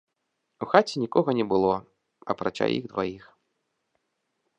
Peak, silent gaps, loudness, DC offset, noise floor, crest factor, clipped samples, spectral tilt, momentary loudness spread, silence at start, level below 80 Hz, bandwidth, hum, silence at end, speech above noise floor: -2 dBFS; none; -26 LUFS; under 0.1%; -79 dBFS; 26 dB; under 0.1%; -6 dB/octave; 13 LU; 0.6 s; -64 dBFS; 10 kHz; none; 1.4 s; 54 dB